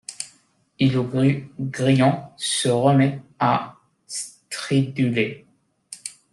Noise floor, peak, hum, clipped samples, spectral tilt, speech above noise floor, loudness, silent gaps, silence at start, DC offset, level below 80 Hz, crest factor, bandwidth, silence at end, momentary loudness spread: -60 dBFS; -4 dBFS; none; under 0.1%; -5.5 dB/octave; 39 dB; -22 LUFS; none; 0.1 s; under 0.1%; -62 dBFS; 18 dB; 12 kHz; 0.2 s; 17 LU